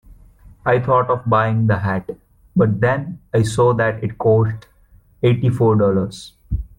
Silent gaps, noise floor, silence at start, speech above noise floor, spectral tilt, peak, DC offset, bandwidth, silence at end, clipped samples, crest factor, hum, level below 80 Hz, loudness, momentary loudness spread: none; -51 dBFS; 0.1 s; 34 dB; -7.5 dB/octave; -4 dBFS; under 0.1%; 11.5 kHz; 0.15 s; under 0.1%; 14 dB; none; -38 dBFS; -18 LUFS; 12 LU